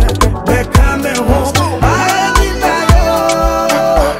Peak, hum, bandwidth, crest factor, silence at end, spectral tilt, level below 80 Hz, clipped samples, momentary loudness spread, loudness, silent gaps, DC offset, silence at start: 0 dBFS; none; 16.5 kHz; 10 dB; 0 s; -5 dB/octave; -16 dBFS; 0.1%; 3 LU; -12 LUFS; none; under 0.1%; 0 s